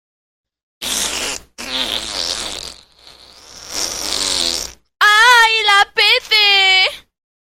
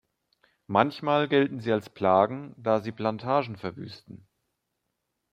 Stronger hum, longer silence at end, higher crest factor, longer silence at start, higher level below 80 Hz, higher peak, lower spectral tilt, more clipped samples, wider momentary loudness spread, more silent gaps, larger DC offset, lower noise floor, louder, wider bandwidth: neither; second, 0.5 s vs 1.15 s; second, 16 dB vs 24 dB; about the same, 0.8 s vs 0.7 s; first, -48 dBFS vs -70 dBFS; first, 0 dBFS vs -4 dBFS; second, 1 dB/octave vs -7.5 dB/octave; neither; first, 17 LU vs 14 LU; neither; neither; second, -44 dBFS vs -81 dBFS; first, -13 LUFS vs -26 LUFS; first, 16.5 kHz vs 10 kHz